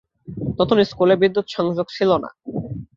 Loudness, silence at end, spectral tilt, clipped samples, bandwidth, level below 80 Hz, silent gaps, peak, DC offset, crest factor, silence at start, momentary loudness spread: -20 LUFS; 0.1 s; -7 dB/octave; under 0.1%; 7.4 kHz; -48 dBFS; none; -2 dBFS; under 0.1%; 18 dB; 0.25 s; 14 LU